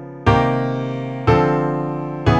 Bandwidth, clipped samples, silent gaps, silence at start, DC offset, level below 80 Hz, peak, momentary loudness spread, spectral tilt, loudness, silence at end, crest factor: 8.4 kHz; under 0.1%; none; 0 s; under 0.1%; -34 dBFS; -2 dBFS; 8 LU; -8 dB/octave; -19 LUFS; 0 s; 16 dB